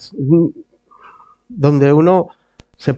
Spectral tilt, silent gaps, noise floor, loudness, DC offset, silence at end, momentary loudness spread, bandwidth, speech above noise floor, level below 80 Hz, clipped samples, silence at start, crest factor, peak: -9.5 dB/octave; none; -45 dBFS; -13 LUFS; under 0.1%; 0 s; 14 LU; 7.2 kHz; 33 dB; -54 dBFS; under 0.1%; 0 s; 16 dB; 0 dBFS